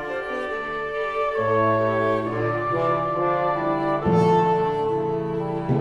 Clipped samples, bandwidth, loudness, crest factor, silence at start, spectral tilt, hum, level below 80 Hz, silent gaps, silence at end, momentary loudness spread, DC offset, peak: under 0.1%; 10 kHz; -23 LUFS; 14 dB; 0 s; -8 dB/octave; none; -50 dBFS; none; 0 s; 8 LU; under 0.1%; -8 dBFS